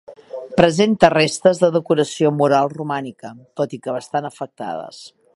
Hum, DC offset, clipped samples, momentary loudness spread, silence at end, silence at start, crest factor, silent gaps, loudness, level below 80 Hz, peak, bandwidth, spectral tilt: none; under 0.1%; under 0.1%; 19 LU; 0.3 s; 0.1 s; 18 dB; none; -18 LUFS; -54 dBFS; 0 dBFS; 11.5 kHz; -5.5 dB/octave